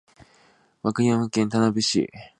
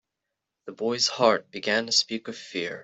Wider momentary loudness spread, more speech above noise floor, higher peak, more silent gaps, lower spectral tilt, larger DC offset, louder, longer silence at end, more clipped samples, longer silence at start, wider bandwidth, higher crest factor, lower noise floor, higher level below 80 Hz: second, 6 LU vs 13 LU; second, 37 dB vs 58 dB; about the same, -6 dBFS vs -6 dBFS; neither; first, -5 dB/octave vs -2 dB/octave; neither; about the same, -23 LUFS vs -25 LUFS; first, 0.15 s vs 0 s; neither; first, 0.85 s vs 0.65 s; first, 11 kHz vs 8.4 kHz; about the same, 18 dB vs 22 dB; second, -59 dBFS vs -84 dBFS; first, -60 dBFS vs -72 dBFS